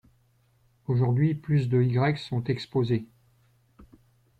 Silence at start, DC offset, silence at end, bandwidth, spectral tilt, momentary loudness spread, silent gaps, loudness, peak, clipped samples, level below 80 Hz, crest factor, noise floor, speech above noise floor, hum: 0.9 s; under 0.1%; 0.6 s; 8.4 kHz; -9 dB/octave; 7 LU; none; -26 LUFS; -14 dBFS; under 0.1%; -60 dBFS; 14 dB; -65 dBFS; 41 dB; none